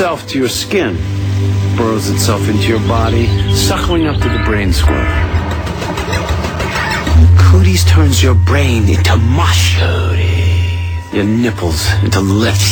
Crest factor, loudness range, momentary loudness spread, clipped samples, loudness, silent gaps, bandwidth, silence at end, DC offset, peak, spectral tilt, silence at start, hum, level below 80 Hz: 10 dB; 4 LU; 7 LU; under 0.1%; -12 LUFS; none; 18 kHz; 0 s; under 0.1%; -2 dBFS; -5.5 dB/octave; 0 s; none; -20 dBFS